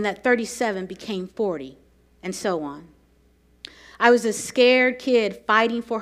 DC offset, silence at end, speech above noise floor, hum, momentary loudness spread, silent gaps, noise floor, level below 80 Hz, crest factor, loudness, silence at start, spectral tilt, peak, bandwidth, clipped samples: under 0.1%; 0 s; 37 dB; none; 20 LU; none; -59 dBFS; -60 dBFS; 22 dB; -21 LUFS; 0 s; -3.5 dB/octave; 0 dBFS; 15 kHz; under 0.1%